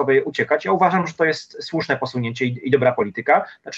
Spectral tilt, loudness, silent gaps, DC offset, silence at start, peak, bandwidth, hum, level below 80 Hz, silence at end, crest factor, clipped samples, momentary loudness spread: -6 dB/octave; -20 LUFS; none; under 0.1%; 0 s; -4 dBFS; 8 kHz; none; -66 dBFS; 0 s; 16 dB; under 0.1%; 7 LU